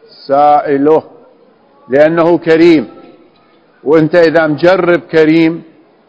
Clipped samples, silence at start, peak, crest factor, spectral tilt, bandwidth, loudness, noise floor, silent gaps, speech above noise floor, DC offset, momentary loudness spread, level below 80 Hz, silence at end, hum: 1%; 0.3 s; 0 dBFS; 10 dB; -7.5 dB/octave; 8 kHz; -9 LUFS; -47 dBFS; none; 39 dB; under 0.1%; 7 LU; -52 dBFS; 0.45 s; none